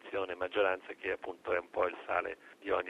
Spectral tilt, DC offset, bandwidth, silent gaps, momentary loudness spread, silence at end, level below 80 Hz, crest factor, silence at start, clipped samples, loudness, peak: -5 dB/octave; under 0.1%; 10.5 kHz; none; 7 LU; 0 s; -70 dBFS; 18 dB; 0.05 s; under 0.1%; -36 LUFS; -18 dBFS